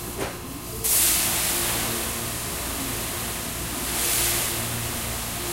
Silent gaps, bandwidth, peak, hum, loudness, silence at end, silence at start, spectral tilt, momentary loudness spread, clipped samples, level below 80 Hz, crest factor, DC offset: none; 16 kHz; -8 dBFS; none; -23 LUFS; 0 s; 0 s; -1.5 dB/octave; 10 LU; under 0.1%; -40 dBFS; 18 dB; under 0.1%